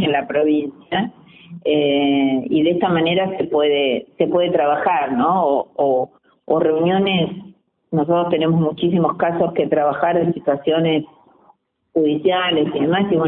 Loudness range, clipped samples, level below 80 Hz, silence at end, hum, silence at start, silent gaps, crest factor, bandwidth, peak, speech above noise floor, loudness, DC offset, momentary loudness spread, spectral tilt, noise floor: 2 LU; under 0.1%; -58 dBFS; 0 s; none; 0 s; none; 16 dB; 4 kHz; -2 dBFS; 39 dB; -18 LUFS; under 0.1%; 6 LU; -11.5 dB/octave; -56 dBFS